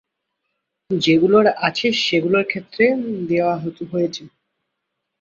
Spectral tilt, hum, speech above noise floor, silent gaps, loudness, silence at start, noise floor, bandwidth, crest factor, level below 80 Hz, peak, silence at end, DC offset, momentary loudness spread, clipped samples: -5.5 dB/octave; none; 60 dB; none; -18 LUFS; 0.9 s; -78 dBFS; 7.6 kHz; 18 dB; -60 dBFS; -2 dBFS; 0.95 s; under 0.1%; 11 LU; under 0.1%